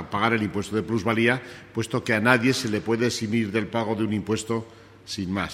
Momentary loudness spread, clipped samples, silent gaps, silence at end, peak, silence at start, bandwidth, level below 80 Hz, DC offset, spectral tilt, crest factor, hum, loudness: 11 LU; under 0.1%; none; 0 s; -2 dBFS; 0 s; 15 kHz; -56 dBFS; under 0.1%; -5 dB/octave; 22 dB; none; -24 LUFS